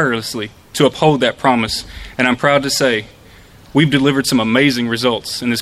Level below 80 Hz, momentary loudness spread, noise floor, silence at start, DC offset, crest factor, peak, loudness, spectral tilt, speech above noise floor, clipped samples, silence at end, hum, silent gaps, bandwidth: -44 dBFS; 9 LU; -42 dBFS; 0 s; under 0.1%; 16 dB; 0 dBFS; -15 LUFS; -4.5 dB/octave; 27 dB; under 0.1%; 0 s; none; none; 14.5 kHz